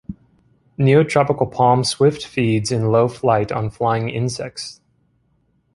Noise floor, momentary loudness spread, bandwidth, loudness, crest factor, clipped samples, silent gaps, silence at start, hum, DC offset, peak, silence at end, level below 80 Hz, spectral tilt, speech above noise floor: -63 dBFS; 14 LU; 11.5 kHz; -18 LUFS; 18 dB; under 0.1%; none; 0.1 s; none; under 0.1%; -2 dBFS; 1.05 s; -50 dBFS; -6 dB/octave; 46 dB